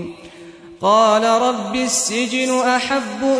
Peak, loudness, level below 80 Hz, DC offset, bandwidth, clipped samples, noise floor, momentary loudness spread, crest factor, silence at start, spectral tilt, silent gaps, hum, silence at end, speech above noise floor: -2 dBFS; -17 LUFS; -56 dBFS; under 0.1%; 11 kHz; under 0.1%; -39 dBFS; 8 LU; 16 dB; 0 s; -2.5 dB/octave; none; none; 0 s; 22 dB